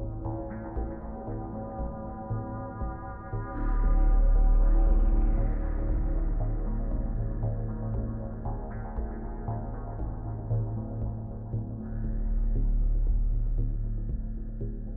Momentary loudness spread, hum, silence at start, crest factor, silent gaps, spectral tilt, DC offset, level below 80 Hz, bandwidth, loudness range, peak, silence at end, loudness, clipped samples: 10 LU; none; 0 s; 14 dB; none; -12 dB/octave; under 0.1%; -28 dBFS; 2.1 kHz; 6 LU; -14 dBFS; 0 s; -33 LUFS; under 0.1%